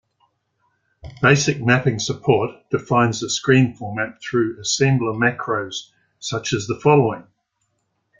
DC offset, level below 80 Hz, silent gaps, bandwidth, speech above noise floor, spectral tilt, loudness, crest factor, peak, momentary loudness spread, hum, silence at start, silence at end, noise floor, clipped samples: under 0.1%; -54 dBFS; none; 9.4 kHz; 52 dB; -5 dB/octave; -19 LUFS; 20 dB; -2 dBFS; 10 LU; none; 1.05 s; 1 s; -71 dBFS; under 0.1%